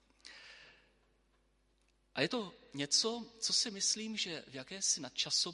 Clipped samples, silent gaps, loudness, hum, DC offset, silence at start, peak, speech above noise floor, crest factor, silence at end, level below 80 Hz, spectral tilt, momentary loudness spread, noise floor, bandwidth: under 0.1%; none; -34 LUFS; none; under 0.1%; 0.25 s; -16 dBFS; 37 dB; 24 dB; 0 s; -76 dBFS; -1 dB/octave; 21 LU; -74 dBFS; 11.5 kHz